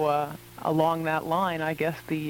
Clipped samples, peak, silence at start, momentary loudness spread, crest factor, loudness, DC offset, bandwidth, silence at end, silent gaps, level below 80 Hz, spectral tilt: under 0.1%; -12 dBFS; 0 s; 6 LU; 16 dB; -27 LUFS; under 0.1%; 18 kHz; 0 s; none; -60 dBFS; -6.5 dB/octave